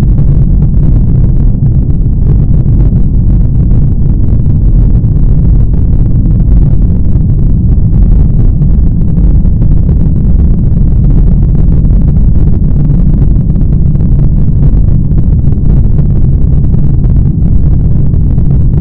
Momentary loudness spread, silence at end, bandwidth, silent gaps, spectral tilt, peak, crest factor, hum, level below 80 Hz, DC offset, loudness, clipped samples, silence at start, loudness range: 1 LU; 0 s; 1.8 kHz; none; -13.5 dB/octave; 0 dBFS; 4 dB; none; -8 dBFS; under 0.1%; -9 LUFS; 8%; 0 s; 0 LU